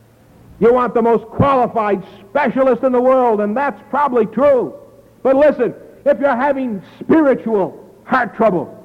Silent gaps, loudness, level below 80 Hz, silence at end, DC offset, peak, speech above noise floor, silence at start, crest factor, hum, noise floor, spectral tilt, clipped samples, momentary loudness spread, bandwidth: none; -15 LUFS; -48 dBFS; 0.05 s; under 0.1%; -4 dBFS; 31 dB; 0.6 s; 12 dB; none; -46 dBFS; -8.5 dB/octave; under 0.1%; 8 LU; 6.6 kHz